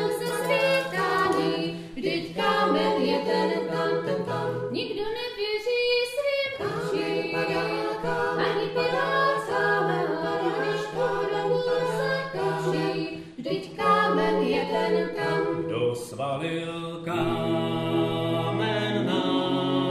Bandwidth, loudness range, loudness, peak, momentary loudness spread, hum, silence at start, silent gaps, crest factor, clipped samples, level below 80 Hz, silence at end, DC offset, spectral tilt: 15.5 kHz; 2 LU; -26 LUFS; -10 dBFS; 7 LU; none; 0 s; none; 16 dB; under 0.1%; -58 dBFS; 0 s; under 0.1%; -5.5 dB/octave